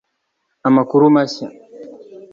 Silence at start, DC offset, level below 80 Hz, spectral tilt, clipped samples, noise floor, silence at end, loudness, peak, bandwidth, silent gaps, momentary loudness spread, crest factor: 0.65 s; under 0.1%; -64 dBFS; -7 dB/octave; under 0.1%; -71 dBFS; 0.4 s; -14 LUFS; -2 dBFS; 7.2 kHz; none; 23 LU; 16 dB